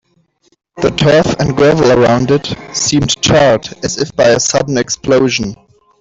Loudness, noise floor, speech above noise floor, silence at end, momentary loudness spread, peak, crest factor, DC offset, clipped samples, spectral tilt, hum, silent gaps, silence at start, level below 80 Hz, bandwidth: -11 LUFS; -56 dBFS; 45 dB; 0.45 s; 8 LU; 0 dBFS; 12 dB; under 0.1%; under 0.1%; -4.5 dB/octave; none; none; 0.75 s; -38 dBFS; 8.2 kHz